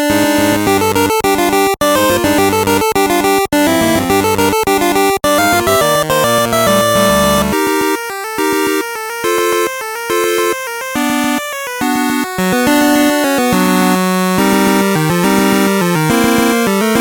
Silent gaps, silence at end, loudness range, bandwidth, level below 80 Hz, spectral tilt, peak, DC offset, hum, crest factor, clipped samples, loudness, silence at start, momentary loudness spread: none; 0 s; 4 LU; 18 kHz; -40 dBFS; -4 dB/octave; 0 dBFS; under 0.1%; none; 12 dB; under 0.1%; -12 LUFS; 0 s; 5 LU